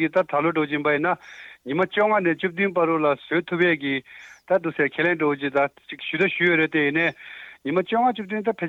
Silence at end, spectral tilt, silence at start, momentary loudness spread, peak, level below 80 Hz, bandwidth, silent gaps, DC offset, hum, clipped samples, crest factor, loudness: 0 s; -7 dB/octave; 0 s; 9 LU; -8 dBFS; -70 dBFS; 7.4 kHz; none; under 0.1%; none; under 0.1%; 14 dB; -22 LUFS